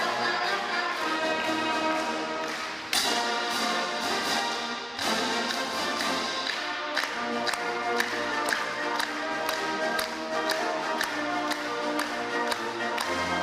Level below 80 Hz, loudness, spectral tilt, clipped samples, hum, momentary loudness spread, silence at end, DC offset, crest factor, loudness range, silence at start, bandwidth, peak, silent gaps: -66 dBFS; -28 LUFS; -1.5 dB/octave; under 0.1%; none; 3 LU; 0 s; under 0.1%; 18 dB; 1 LU; 0 s; 15.5 kHz; -12 dBFS; none